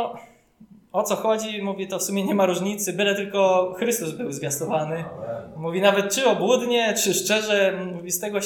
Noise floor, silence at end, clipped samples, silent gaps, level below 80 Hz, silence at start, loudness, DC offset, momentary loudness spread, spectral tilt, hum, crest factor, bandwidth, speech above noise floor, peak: -51 dBFS; 0 s; under 0.1%; none; -66 dBFS; 0 s; -23 LUFS; under 0.1%; 10 LU; -3.5 dB/octave; none; 18 dB; 19 kHz; 28 dB; -4 dBFS